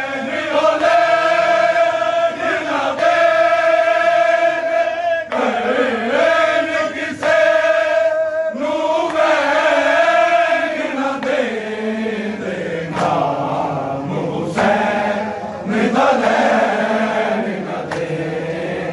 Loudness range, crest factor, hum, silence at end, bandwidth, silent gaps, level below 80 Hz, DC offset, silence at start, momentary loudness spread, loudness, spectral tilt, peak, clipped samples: 5 LU; 14 dB; none; 0 s; 11.5 kHz; none; -58 dBFS; under 0.1%; 0 s; 9 LU; -16 LUFS; -5 dB/octave; -4 dBFS; under 0.1%